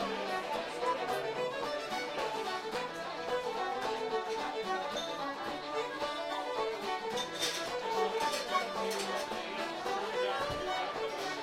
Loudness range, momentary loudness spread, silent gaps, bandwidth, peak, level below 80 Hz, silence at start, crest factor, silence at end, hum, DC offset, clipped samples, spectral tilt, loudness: 2 LU; 4 LU; none; 16 kHz; -18 dBFS; -66 dBFS; 0 s; 18 dB; 0 s; none; under 0.1%; under 0.1%; -2.5 dB/octave; -35 LUFS